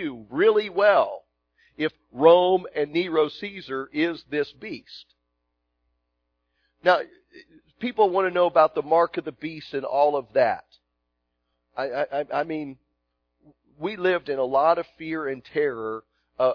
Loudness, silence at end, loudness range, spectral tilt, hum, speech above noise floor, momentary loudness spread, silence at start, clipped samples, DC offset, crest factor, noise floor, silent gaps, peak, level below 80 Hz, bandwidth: -24 LUFS; 0 s; 8 LU; -7 dB/octave; 60 Hz at -65 dBFS; 54 dB; 15 LU; 0 s; under 0.1%; under 0.1%; 22 dB; -77 dBFS; none; -4 dBFS; -68 dBFS; 5.4 kHz